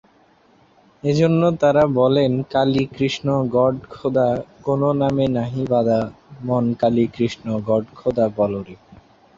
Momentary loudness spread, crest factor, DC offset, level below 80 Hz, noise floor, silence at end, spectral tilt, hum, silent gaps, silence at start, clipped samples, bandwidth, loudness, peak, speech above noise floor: 8 LU; 16 dB; under 0.1%; -52 dBFS; -55 dBFS; 0.6 s; -7.5 dB/octave; none; none; 1.05 s; under 0.1%; 7.6 kHz; -19 LUFS; -4 dBFS; 36 dB